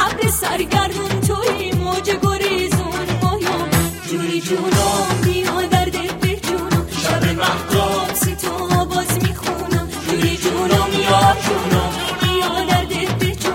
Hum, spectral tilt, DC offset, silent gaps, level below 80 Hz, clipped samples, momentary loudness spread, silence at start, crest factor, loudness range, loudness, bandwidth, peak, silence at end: none; -4.5 dB/octave; under 0.1%; none; -34 dBFS; under 0.1%; 5 LU; 0 s; 16 dB; 2 LU; -18 LUFS; 16.5 kHz; -2 dBFS; 0 s